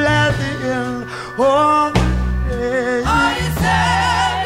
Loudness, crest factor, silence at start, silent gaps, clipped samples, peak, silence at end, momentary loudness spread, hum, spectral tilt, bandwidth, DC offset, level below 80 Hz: -17 LUFS; 14 dB; 0 s; none; under 0.1%; -2 dBFS; 0 s; 7 LU; none; -5 dB/octave; 16 kHz; under 0.1%; -26 dBFS